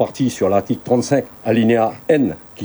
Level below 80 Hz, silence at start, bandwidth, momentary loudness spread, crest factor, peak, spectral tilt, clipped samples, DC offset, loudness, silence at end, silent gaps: -54 dBFS; 0 s; over 20 kHz; 4 LU; 16 dB; 0 dBFS; -6.5 dB/octave; under 0.1%; under 0.1%; -17 LUFS; 0 s; none